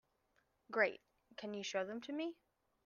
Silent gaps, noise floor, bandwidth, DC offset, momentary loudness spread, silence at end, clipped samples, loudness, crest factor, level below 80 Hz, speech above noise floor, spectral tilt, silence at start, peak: none; -80 dBFS; 7.2 kHz; under 0.1%; 16 LU; 0.5 s; under 0.1%; -41 LUFS; 22 dB; -86 dBFS; 39 dB; -3.5 dB/octave; 0.7 s; -22 dBFS